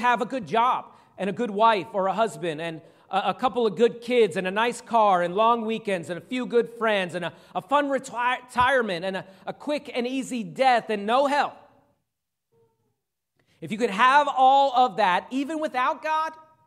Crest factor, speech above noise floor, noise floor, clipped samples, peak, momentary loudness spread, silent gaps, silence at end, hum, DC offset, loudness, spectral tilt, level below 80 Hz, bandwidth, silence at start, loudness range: 20 dB; 60 dB; -83 dBFS; under 0.1%; -4 dBFS; 12 LU; none; 0.25 s; none; under 0.1%; -24 LUFS; -4.5 dB/octave; -66 dBFS; 13.5 kHz; 0 s; 4 LU